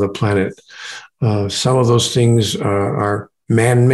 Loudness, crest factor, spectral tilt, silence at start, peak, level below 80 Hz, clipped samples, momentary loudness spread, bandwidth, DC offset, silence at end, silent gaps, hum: -16 LUFS; 14 dB; -5.5 dB/octave; 0 s; -2 dBFS; -52 dBFS; under 0.1%; 14 LU; 12.5 kHz; under 0.1%; 0 s; none; none